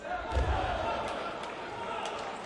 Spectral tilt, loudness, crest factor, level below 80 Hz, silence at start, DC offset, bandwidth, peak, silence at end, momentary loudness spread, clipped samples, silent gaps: -5 dB/octave; -34 LUFS; 16 dB; -40 dBFS; 0 s; under 0.1%; 11.5 kHz; -18 dBFS; 0 s; 7 LU; under 0.1%; none